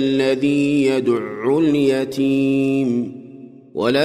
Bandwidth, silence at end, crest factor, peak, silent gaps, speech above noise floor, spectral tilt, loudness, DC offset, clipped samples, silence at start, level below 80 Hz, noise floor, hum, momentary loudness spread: 12.5 kHz; 0 s; 12 dB; -6 dBFS; none; 22 dB; -6.5 dB/octave; -18 LUFS; under 0.1%; under 0.1%; 0 s; -62 dBFS; -39 dBFS; none; 7 LU